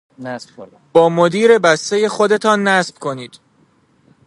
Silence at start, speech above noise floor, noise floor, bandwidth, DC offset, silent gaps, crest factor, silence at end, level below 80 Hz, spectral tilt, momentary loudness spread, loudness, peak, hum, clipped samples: 0.2 s; 41 dB; -55 dBFS; 11.5 kHz; under 0.1%; none; 16 dB; 1 s; -66 dBFS; -4.5 dB/octave; 18 LU; -14 LUFS; 0 dBFS; none; under 0.1%